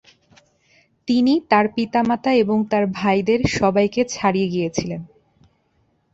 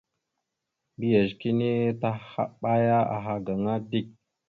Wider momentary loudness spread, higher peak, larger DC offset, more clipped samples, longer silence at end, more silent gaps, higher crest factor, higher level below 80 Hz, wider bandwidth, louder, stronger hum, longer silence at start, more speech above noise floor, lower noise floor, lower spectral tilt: about the same, 7 LU vs 9 LU; first, -2 dBFS vs -10 dBFS; neither; neither; first, 1.05 s vs 0.4 s; neither; about the same, 18 dB vs 18 dB; first, -50 dBFS vs -62 dBFS; first, 8 kHz vs 4.6 kHz; first, -19 LUFS vs -27 LUFS; neither; about the same, 1.05 s vs 1 s; second, 46 dB vs 57 dB; second, -64 dBFS vs -83 dBFS; second, -5.5 dB/octave vs -9.5 dB/octave